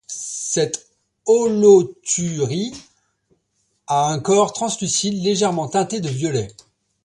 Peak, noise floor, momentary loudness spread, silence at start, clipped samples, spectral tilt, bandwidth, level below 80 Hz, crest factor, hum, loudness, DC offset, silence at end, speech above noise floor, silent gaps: -2 dBFS; -68 dBFS; 13 LU; 0.1 s; under 0.1%; -4.5 dB/octave; 11.5 kHz; -58 dBFS; 18 dB; none; -19 LUFS; under 0.1%; 0.55 s; 50 dB; none